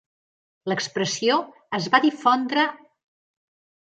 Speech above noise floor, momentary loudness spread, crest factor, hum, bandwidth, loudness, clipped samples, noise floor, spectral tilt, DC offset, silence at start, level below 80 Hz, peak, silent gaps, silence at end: over 68 dB; 9 LU; 22 dB; none; 9.2 kHz; -22 LUFS; under 0.1%; under -90 dBFS; -3.5 dB/octave; under 0.1%; 0.65 s; -74 dBFS; -2 dBFS; none; 1.1 s